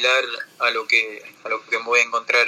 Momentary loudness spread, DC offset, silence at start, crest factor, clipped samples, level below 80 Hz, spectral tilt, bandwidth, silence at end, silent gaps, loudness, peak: 11 LU; under 0.1%; 0 s; 18 dB; under 0.1%; -88 dBFS; 0.5 dB/octave; 16 kHz; 0 s; none; -20 LUFS; -4 dBFS